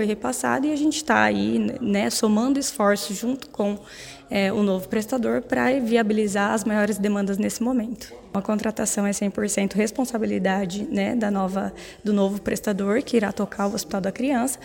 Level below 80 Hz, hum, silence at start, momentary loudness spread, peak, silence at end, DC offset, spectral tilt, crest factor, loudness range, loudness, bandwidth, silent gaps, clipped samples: -54 dBFS; none; 0 s; 7 LU; -4 dBFS; 0 s; under 0.1%; -4.5 dB/octave; 20 dB; 2 LU; -23 LUFS; 17 kHz; none; under 0.1%